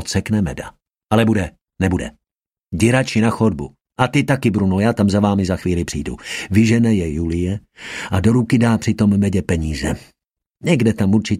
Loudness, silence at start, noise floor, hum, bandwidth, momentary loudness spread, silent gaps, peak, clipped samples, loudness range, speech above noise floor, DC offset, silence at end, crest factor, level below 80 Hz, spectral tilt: -18 LUFS; 0 s; -87 dBFS; none; 14 kHz; 13 LU; 10.46-10.50 s; 0 dBFS; under 0.1%; 2 LU; 71 dB; under 0.1%; 0 s; 16 dB; -38 dBFS; -6.5 dB/octave